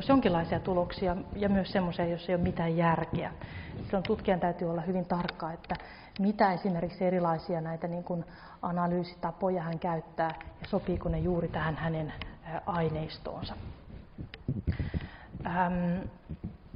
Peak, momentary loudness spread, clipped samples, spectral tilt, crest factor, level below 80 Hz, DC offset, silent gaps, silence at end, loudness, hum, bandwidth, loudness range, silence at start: -12 dBFS; 13 LU; under 0.1%; -6 dB/octave; 20 dB; -48 dBFS; under 0.1%; none; 0 s; -32 LUFS; none; 5.4 kHz; 5 LU; 0 s